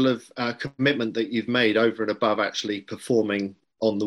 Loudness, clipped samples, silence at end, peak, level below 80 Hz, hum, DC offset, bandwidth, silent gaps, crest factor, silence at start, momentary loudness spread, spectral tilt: -24 LUFS; under 0.1%; 0 s; -6 dBFS; -68 dBFS; none; under 0.1%; 15 kHz; none; 18 dB; 0 s; 8 LU; -5 dB/octave